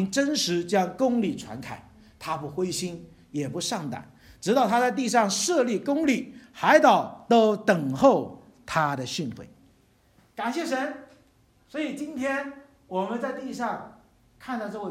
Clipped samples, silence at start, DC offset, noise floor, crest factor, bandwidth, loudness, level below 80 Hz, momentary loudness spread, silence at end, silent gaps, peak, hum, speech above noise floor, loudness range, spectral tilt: under 0.1%; 0 s; under 0.1%; -61 dBFS; 22 dB; 16 kHz; -25 LUFS; -64 dBFS; 18 LU; 0 s; none; -4 dBFS; none; 36 dB; 10 LU; -4 dB/octave